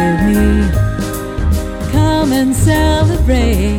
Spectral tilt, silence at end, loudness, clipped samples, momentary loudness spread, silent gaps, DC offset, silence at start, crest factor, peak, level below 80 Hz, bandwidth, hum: -6 dB/octave; 0 s; -14 LUFS; under 0.1%; 6 LU; none; under 0.1%; 0 s; 12 dB; 0 dBFS; -18 dBFS; 17 kHz; none